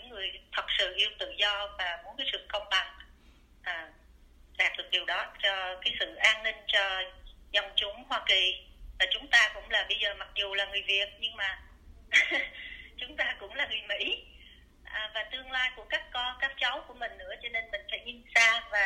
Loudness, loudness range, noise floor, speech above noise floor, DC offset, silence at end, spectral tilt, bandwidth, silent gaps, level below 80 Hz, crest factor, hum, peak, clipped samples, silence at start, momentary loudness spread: -29 LUFS; 6 LU; -58 dBFS; 27 dB; under 0.1%; 0 s; 0 dB/octave; 16 kHz; none; -56 dBFS; 24 dB; none; -8 dBFS; under 0.1%; 0 s; 14 LU